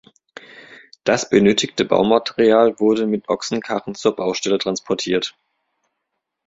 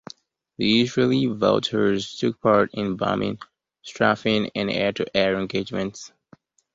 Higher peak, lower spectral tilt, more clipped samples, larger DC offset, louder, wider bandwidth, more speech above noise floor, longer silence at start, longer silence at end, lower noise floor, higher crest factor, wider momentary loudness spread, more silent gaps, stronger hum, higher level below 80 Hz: first, 0 dBFS vs -4 dBFS; about the same, -4.5 dB/octave vs -5.5 dB/octave; neither; neither; first, -18 LUFS vs -22 LUFS; about the same, 8 kHz vs 7.8 kHz; first, 60 dB vs 33 dB; first, 1.05 s vs 0.6 s; first, 1.15 s vs 0.7 s; first, -77 dBFS vs -55 dBFS; about the same, 18 dB vs 20 dB; second, 8 LU vs 14 LU; neither; neither; about the same, -58 dBFS vs -56 dBFS